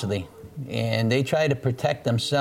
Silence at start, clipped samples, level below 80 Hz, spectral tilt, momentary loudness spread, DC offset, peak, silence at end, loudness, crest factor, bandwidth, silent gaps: 0 s; under 0.1%; -56 dBFS; -6 dB/octave; 9 LU; under 0.1%; -10 dBFS; 0 s; -25 LUFS; 14 dB; 15.5 kHz; none